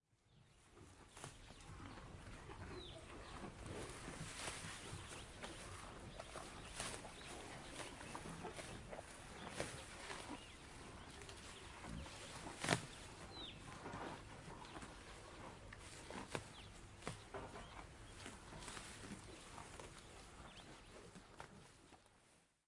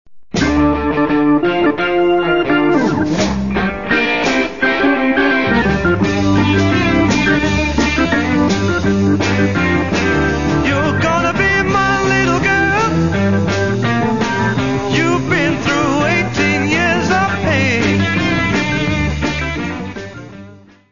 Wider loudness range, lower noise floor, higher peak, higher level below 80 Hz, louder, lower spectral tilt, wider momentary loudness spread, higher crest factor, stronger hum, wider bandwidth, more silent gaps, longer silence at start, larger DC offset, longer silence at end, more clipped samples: first, 7 LU vs 2 LU; first, -73 dBFS vs -39 dBFS; second, -14 dBFS vs -2 dBFS; second, -64 dBFS vs -32 dBFS; second, -52 LUFS vs -14 LUFS; second, -3.5 dB/octave vs -5.5 dB/octave; first, 10 LU vs 4 LU; first, 38 dB vs 12 dB; neither; first, 11.5 kHz vs 7.4 kHz; neither; about the same, 0.1 s vs 0.15 s; second, under 0.1% vs 1%; first, 0.2 s vs 0 s; neither